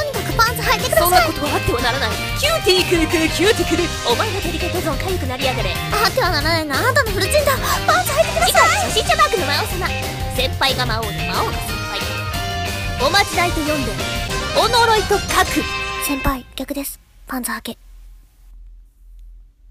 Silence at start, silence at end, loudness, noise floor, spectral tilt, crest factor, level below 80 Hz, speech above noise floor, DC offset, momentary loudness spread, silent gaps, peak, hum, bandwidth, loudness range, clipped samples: 0 s; 0.25 s; -17 LUFS; -42 dBFS; -3.5 dB/octave; 18 dB; -32 dBFS; 25 dB; under 0.1%; 9 LU; none; 0 dBFS; none; 15.5 kHz; 6 LU; under 0.1%